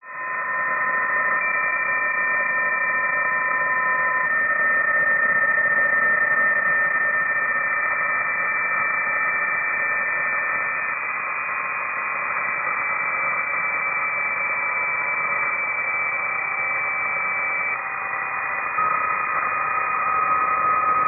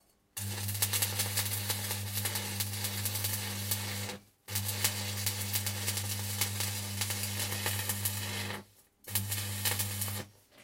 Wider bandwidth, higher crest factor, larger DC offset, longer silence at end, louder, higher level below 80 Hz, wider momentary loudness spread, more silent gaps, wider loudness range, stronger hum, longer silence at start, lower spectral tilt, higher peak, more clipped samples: second, 2.9 kHz vs 17 kHz; second, 12 dB vs 24 dB; neither; about the same, 0 s vs 0 s; first, -20 LUFS vs -33 LUFS; about the same, -64 dBFS vs -68 dBFS; about the same, 6 LU vs 8 LU; neither; about the same, 4 LU vs 2 LU; neither; second, 0.05 s vs 0.35 s; second, 5.5 dB/octave vs -2 dB/octave; about the same, -10 dBFS vs -12 dBFS; neither